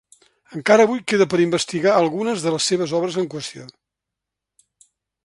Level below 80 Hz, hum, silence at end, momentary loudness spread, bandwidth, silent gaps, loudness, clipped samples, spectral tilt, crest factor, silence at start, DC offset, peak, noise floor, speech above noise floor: -64 dBFS; none; 1.55 s; 15 LU; 11.5 kHz; none; -19 LUFS; under 0.1%; -4.5 dB/octave; 20 dB; 0.5 s; under 0.1%; 0 dBFS; -84 dBFS; 65 dB